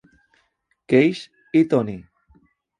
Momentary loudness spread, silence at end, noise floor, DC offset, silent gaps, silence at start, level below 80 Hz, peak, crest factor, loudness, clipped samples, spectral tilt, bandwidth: 16 LU; 0.8 s; -68 dBFS; under 0.1%; none; 0.9 s; -60 dBFS; -2 dBFS; 20 dB; -20 LUFS; under 0.1%; -7.5 dB/octave; 10 kHz